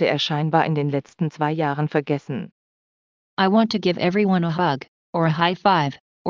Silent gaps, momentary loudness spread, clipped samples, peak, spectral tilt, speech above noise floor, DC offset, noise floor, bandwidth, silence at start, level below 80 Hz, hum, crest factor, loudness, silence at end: 2.52-3.37 s, 4.88-5.13 s, 6.00-6.25 s; 10 LU; under 0.1%; -2 dBFS; -7 dB/octave; over 69 dB; under 0.1%; under -90 dBFS; 7.4 kHz; 0 s; -66 dBFS; none; 18 dB; -21 LUFS; 0 s